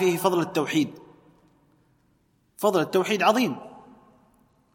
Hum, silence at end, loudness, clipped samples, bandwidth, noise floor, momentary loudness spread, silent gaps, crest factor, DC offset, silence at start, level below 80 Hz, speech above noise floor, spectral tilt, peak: none; 0.95 s; -24 LUFS; under 0.1%; 16.5 kHz; -66 dBFS; 9 LU; none; 20 dB; under 0.1%; 0 s; -72 dBFS; 43 dB; -5 dB/octave; -6 dBFS